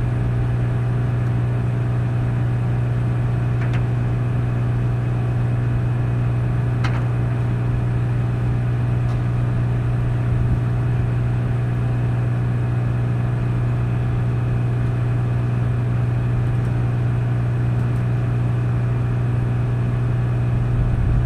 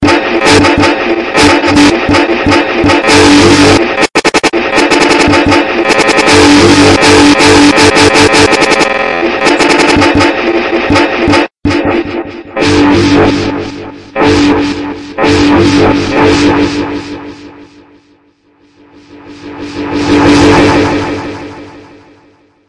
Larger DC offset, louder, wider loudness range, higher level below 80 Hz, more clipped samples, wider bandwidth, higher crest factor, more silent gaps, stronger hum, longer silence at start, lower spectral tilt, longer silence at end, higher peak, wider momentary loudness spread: neither; second, -21 LUFS vs -6 LUFS; second, 0 LU vs 7 LU; about the same, -30 dBFS vs -30 dBFS; second, under 0.1% vs 2%; second, 4.4 kHz vs 12 kHz; about the same, 12 dB vs 8 dB; neither; first, 60 Hz at -20 dBFS vs none; about the same, 0 s vs 0 s; first, -9 dB/octave vs -4 dB/octave; second, 0 s vs 0.9 s; second, -8 dBFS vs 0 dBFS; second, 1 LU vs 14 LU